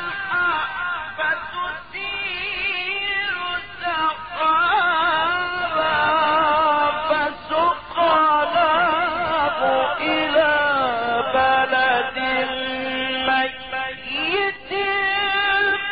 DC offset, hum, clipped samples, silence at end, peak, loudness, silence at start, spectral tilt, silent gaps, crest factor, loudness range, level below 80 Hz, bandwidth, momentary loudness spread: 0.4%; none; under 0.1%; 0 s; -6 dBFS; -20 LUFS; 0 s; 0.5 dB/octave; none; 14 dB; 5 LU; -52 dBFS; 4.9 kHz; 8 LU